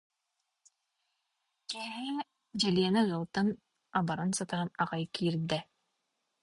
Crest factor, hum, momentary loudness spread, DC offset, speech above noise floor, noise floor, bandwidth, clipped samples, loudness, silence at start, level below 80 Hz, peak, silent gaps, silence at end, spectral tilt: 18 dB; none; 11 LU; under 0.1%; 52 dB; -84 dBFS; 11.5 kHz; under 0.1%; -33 LUFS; 1.7 s; -68 dBFS; -16 dBFS; none; 0.8 s; -5 dB/octave